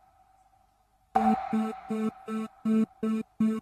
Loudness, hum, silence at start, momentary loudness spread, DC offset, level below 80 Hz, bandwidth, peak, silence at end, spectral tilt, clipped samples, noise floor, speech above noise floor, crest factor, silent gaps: -30 LUFS; none; 1.15 s; 7 LU; under 0.1%; -64 dBFS; 9.4 kHz; -10 dBFS; 0 s; -7.5 dB/octave; under 0.1%; -67 dBFS; 38 dB; 20 dB; none